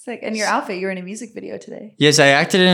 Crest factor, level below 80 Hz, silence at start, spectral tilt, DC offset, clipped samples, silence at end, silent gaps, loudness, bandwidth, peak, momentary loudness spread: 16 dB; -70 dBFS; 0.05 s; -3.5 dB/octave; under 0.1%; under 0.1%; 0 s; none; -16 LUFS; 17.5 kHz; -2 dBFS; 20 LU